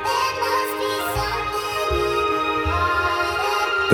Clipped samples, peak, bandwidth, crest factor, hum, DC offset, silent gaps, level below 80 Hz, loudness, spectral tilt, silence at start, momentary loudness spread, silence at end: under 0.1%; -2 dBFS; over 20 kHz; 20 dB; none; under 0.1%; none; -38 dBFS; -21 LUFS; -4 dB/octave; 0 s; 3 LU; 0 s